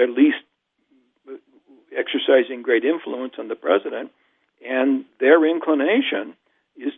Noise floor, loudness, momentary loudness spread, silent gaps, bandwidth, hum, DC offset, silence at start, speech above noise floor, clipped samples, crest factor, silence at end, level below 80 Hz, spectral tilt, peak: -67 dBFS; -20 LUFS; 20 LU; none; 3.9 kHz; none; under 0.1%; 0 s; 48 dB; under 0.1%; 20 dB; 0 s; -82 dBFS; -7.5 dB/octave; -2 dBFS